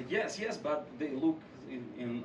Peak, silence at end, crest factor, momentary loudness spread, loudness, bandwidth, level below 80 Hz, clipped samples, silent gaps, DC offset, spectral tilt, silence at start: -20 dBFS; 0 s; 16 dB; 11 LU; -36 LUFS; 10.5 kHz; -72 dBFS; under 0.1%; none; under 0.1%; -5 dB/octave; 0 s